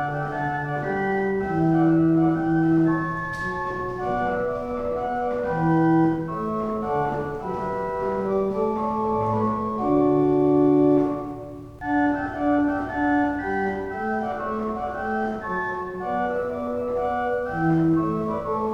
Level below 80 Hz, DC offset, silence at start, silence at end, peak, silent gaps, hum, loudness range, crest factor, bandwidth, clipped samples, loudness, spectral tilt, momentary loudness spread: -48 dBFS; under 0.1%; 0 s; 0 s; -8 dBFS; none; none; 5 LU; 14 dB; 7 kHz; under 0.1%; -24 LUFS; -9 dB/octave; 9 LU